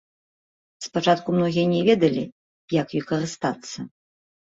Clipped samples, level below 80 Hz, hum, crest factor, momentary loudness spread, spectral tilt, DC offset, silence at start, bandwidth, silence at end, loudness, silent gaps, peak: under 0.1%; -62 dBFS; none; 20 dB; 17 LU; -6 dB/octave; under 0.1%; 0.8 s; 8 kHz; 0.6 s; -23 LUFS; 2.32-2.68 s; -4 dBFS